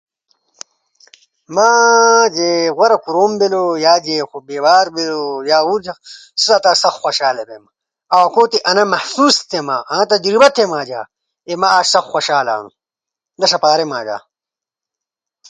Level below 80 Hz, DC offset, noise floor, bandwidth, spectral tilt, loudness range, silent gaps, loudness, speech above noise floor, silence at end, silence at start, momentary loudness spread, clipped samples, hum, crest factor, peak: -64 dBFS; under 0.1%; -87 dBFS; 9.6 kHz; -2 dB/octave; 3 LU; none; -13 LUFS; 74 dB; 1.3 s; 1.5 s; 13 LU; under 0.1%; none; 14 dB; 0 dBFS